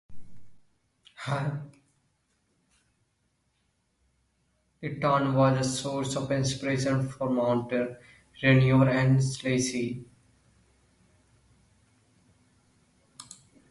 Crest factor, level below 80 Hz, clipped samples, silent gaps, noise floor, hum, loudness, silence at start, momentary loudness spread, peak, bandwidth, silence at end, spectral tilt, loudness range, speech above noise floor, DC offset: 22 dB; -60 dBFS; under 0.1%; none; -74 dBFS; none; -27 LUFS; 0.1 s; 18 LU; -8 dBFS; 11.5 kHz; 0.35 s; -6 dB/octave; 14 LU; 48 dB; under 0.1%